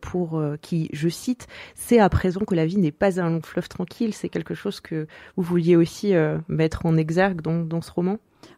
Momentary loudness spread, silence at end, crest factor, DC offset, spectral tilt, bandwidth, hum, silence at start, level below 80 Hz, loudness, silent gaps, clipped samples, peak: 12 LU; 0.1 s; 18 dB; under 0.1%; -7 dB/octave; 15 kHz; none; 0 s; -44 dBFS; -23 LUFS; none; under 0.1%; -6 dBFS